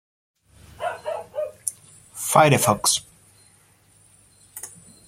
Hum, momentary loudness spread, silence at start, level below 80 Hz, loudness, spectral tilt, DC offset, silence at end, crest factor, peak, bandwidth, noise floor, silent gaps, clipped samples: none; 22 LU; 0.8 s; -60 dBFS; -22 LUFS; -3.5 dB/octave; under 0.1%; 0.4 s; 24 dB; -2 dBFS; 16.5 kHz; -57 dBFS; none; under 0.1%